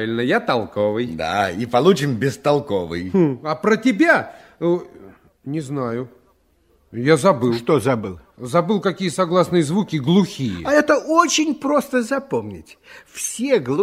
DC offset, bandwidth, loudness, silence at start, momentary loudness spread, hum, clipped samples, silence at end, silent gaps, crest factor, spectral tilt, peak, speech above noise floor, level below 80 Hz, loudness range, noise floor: under 0.1%; 16 kHz; -19 LUFS; 0 s; 11 LU; none; under 0.1%; 0 s; none; 18 dB; -5 dB/octave; -2 dBFS; 41 dB; -56 dBFS; 4 LU; -59 dBFS